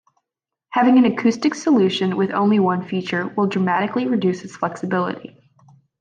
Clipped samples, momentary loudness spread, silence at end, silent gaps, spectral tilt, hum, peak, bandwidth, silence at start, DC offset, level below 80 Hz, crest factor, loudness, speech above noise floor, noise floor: under 0.1%; 10 LU; 0.75 s; none; -6.5 dB/octave; none; -6 dBFS; 9.2 kHz; 0.7 s; under 0.1%; -66 dBFS; 14 dB; -19 LUFS; 66 dB; -84 dBFS